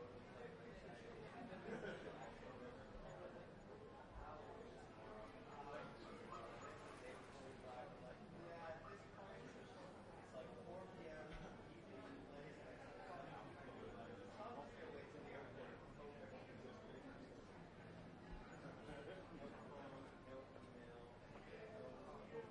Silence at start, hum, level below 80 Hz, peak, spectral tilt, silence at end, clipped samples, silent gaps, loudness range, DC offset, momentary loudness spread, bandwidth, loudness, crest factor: 0 s; none; -70 dBFS; -40 dBFS; -6 dB/octave; 0 s; under 0.1%; none; 2 LU; under 0.1%; 5 LU; 10.5 kHz; -57 LUFS; 18 dB